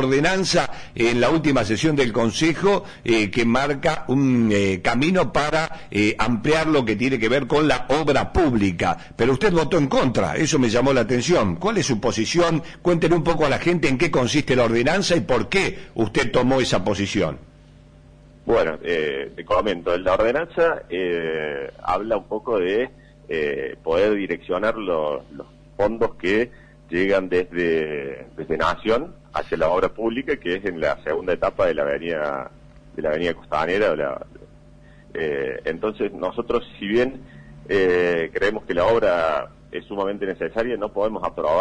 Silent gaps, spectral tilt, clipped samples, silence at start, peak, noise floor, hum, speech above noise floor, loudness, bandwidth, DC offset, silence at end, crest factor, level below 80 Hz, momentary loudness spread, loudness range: none; -5 dB/octave; under 0.1%; 0 s; -8 dBFS; -47 dBFS; none; 27 dB; -21 LUFS; 10.5 kHz; under 0.1%; 0 s; 12 dB; -42 dBFS; 8 LU; 5 LU